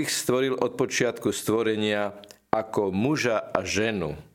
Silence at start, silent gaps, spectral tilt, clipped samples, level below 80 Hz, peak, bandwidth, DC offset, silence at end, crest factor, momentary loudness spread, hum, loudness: 0 s; none; -4 dB/octave; under 0.1%; -58 dBFS; -2 dBFS; 17 kHz; under 0.1%; 0.15 s; 24 dB; 4 LU; none; -26 LUFS